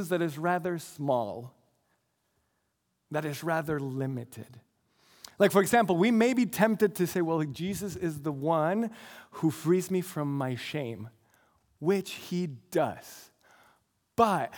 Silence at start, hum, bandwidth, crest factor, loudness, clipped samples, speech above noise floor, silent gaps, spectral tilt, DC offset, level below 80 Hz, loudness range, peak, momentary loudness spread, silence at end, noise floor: 0 s; none; 19.5 kHz; 22 dB; -29 LUFS; under 0.1%; 49 dB; none; -6 dB/octave; under 0.1%; -70 dBFS; 9 LU; -8 dBFS; 15 LU; 0 s; -78 dBFS